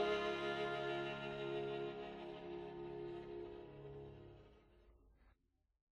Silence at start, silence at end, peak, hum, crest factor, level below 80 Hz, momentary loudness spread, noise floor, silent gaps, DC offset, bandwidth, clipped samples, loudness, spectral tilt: 0 s; 0.65 s; -28 dBFS; none; 18 dB; -70 dBFS; 14 LU; -79 dBFS; none; under 0.1%; 10.5 kHz; under 0.1%; -46 LUFS; -6 dB/octave